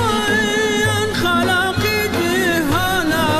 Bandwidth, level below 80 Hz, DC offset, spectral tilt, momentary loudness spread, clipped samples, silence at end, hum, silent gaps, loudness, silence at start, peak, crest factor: 14.5 kHz; -38 dBFS; under 0.1%; -4 dB/octave; 2 LU; under 0.1%; 0 s; none; none; -17 LUFS; 0 s; -8 dBFS; 10 dB